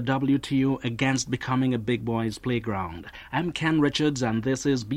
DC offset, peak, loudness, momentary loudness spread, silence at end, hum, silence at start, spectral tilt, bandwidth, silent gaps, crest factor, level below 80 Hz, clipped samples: under 0.1%; -8 dBFS; -26 LUFS; 7 LU; 0 s; none; 0 s; -5.5 dB/octave; 12.5 kHz; none; 16 dB; -52 dBFS; under 0.1%